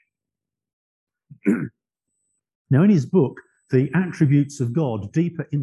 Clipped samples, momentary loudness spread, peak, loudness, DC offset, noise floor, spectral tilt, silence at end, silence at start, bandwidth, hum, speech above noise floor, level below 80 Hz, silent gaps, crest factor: under 0.1%; 8 LU; -6 dBFS; -21 LUFS; under 0.1%; -87 dBFS; -8.5 dB/octave; 0 s; 1.45 s; 11.5 kHz; none; 68 dB; -58 dBFS; 2.55-2.65 s; 16 dB